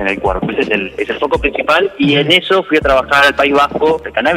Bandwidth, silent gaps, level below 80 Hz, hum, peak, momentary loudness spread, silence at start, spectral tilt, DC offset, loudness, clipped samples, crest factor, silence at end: 16 kHz; none; -34 dBFS; none; 0 dBFS; 7 LU; 0 s; -5 dB/octave; under 0.1%; -12 LUFS; under 0.1%; 12 dB; 0 s